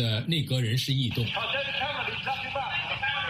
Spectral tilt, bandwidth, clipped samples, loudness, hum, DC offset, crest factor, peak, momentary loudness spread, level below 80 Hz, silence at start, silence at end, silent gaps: -5 dB/octave; 15.5 kHz; under 0.1%; -28 LUFS; none; under 0.1%; 14 dB; -14 dBFS; 3 LU; -56 dBFS; 0 s; 0 s; none